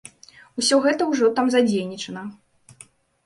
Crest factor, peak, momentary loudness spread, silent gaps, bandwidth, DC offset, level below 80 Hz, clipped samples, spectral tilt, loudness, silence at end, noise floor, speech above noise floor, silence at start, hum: 16 dB; -6 dBFS; 17 LU; none; 11.5 kHz; under 0.1%; -66 dBFS; under 0.1%; -3.5 dB/octave; -21 LUFS; 0.95 s; -51 dBFS; 31 dB; 0.55 s; none